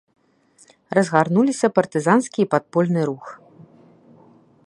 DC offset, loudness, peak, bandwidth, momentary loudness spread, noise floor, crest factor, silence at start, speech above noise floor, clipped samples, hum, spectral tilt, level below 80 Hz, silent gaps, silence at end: under 0.1%; -19 LUFS; 0 dBFS; 11 kHz; 7 LU; -56 dBFS; 20 dB; 0.9 s; 37 dB; under 0.1%; none; -6.5 dB/octave; -68 dBFS; none; 1.3 s